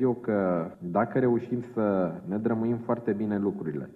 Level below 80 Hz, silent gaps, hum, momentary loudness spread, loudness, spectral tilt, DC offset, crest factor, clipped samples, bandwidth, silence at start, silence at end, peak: -66 dBFS; none; none; 5 LU; -28 LUFS; -11 dB/octave; under 0.1%; 16 dB; under 0.1%; 4.3 kHz; 0 s; 0 s; -12 dBFS